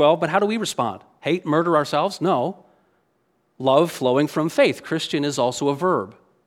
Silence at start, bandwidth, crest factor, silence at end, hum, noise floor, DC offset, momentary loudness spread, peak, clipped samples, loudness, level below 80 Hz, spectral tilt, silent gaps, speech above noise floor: 0 s; 16 kHz; 20 dB; 0.35 s; none; -67 dBFS; under 0.1%; 7 LU; -2 dBFS; under 0.1%; -21 LUFS; -68 dBFS; -5 dB/octave; none; 47 dB